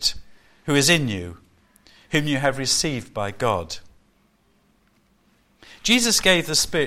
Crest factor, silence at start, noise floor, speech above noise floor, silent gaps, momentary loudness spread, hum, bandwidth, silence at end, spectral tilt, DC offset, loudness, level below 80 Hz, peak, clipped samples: 20 dB; 0 s; -62 dBFS; 41 dB; none; 18 LU; none; 16.5 kHz; 0 s; -3 dB/octave; under 0.1%; -20 LUFS; -48 dBFS; -4 dBFS; under 0.1%